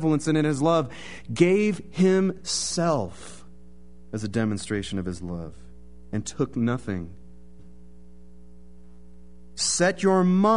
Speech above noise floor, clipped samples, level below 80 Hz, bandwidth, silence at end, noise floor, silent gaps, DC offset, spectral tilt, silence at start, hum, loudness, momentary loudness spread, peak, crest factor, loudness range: 26 dB; under 0.1%; -50 dBFS; 11 kHz; 0 s; -50 dBFS; none; 0.8%; -5 dB/octave; 0 s; 60 Hz at -45 dBFS; -25 LUFS; 16 LU; -6 dBFS; 20 dB; 9 LU